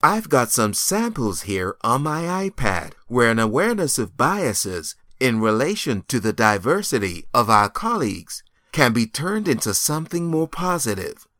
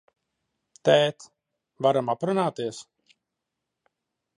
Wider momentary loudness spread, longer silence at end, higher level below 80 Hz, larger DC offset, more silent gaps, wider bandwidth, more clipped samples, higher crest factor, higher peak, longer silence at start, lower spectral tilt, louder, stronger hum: second, 8 LU vs 13 LU; second, 0.25 s vs 1.55 s; first, -46 dBFS vs -76 dBFS; neither; neither; first, 19.5 kHz vs 11 kHz; neither; about the same, 20 dB vs 22 dB; first, 0 dBFS vs -6 dBFS; second, 0.05 s vs 0.85 s; about the same, -4 dB/octave vs -5 dB/octave; first, -21 LUFS vs -25 LUFS; neither